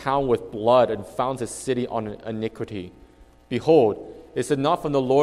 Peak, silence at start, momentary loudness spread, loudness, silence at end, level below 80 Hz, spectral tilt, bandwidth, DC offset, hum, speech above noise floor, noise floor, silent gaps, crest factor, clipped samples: -4 dBFS; 0 s; 14 LU; -23 LUFS; 0 s; -52 dBFS; -6 dB/octave; 13 kHz; under 0.1%; none; 29 dB; -51 dBFS; none; 18 dB; under 0.1%